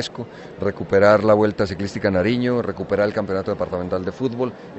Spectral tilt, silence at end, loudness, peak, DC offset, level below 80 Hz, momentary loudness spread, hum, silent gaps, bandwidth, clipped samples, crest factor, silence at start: -7 dB/octave; 0 s; -20 LUFS; -2 dBFS; under 0.1%; -50 dBFS; 12 LU; none; none; 8.2 kHz; under 0.1%; 18 dB; 0 s